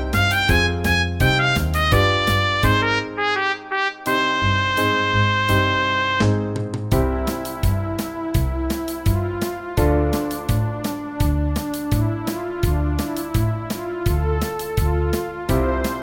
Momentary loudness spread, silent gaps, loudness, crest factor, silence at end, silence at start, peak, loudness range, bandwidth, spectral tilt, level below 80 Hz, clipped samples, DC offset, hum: 7 LU; none; -20 LUFS; 16 dB; 0 s; 0 s; -4 dBFS; 4 LU; 17 kHz; -5.5 dB/octave; -28 dBFS; under 0.1%; under 0.1%; none